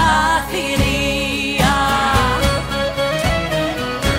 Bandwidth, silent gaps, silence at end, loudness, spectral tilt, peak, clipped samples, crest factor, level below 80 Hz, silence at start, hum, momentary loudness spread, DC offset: 16 kHz; none; 0 s; -17 LUFS; -4 dB/octave; -4 dBFS; under 0.1%; 14 dB; -28 dBFS; 0 s; none; 5 LU; under 0.1%